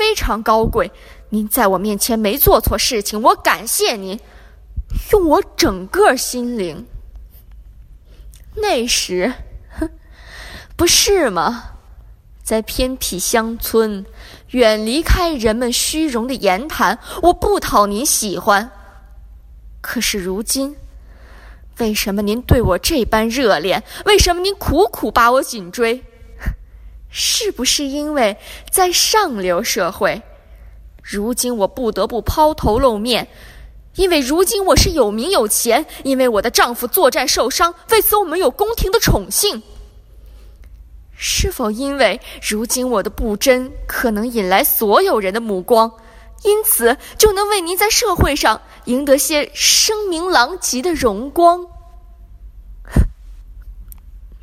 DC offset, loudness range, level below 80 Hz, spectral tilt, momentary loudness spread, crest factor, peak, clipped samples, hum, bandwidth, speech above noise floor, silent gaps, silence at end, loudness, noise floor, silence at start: under 0.1%; 6 LU; -30 dBFS; -3 dB/octave; 11 LU; 16 dB; 0 dBFS; under 0.1%; none; 16 kHz; 25 dB; none; 0.05 s; -15 LUFS; -41 dBFS; 0 s